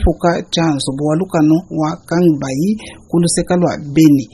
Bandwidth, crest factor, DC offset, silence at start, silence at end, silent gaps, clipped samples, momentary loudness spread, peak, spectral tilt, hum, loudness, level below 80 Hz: 12.5 kHz; 14 dB; under 0.1%; 0 s; 0.1 s; none; under 0.1%; 7 LU; 0 dBFS; -6 dB/octave; none; -15 LUFS; -28 dBFS